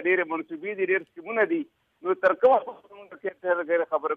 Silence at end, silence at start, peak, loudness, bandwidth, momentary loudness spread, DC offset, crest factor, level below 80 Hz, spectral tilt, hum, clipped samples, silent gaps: 0 s; 0 s; -10 dBFS; -26 LUFS; 4.7 kHz; 14 LU; under 0.1%; 16 dB; -72 dBFS; -7 dB/octave; none; under 0.1%; none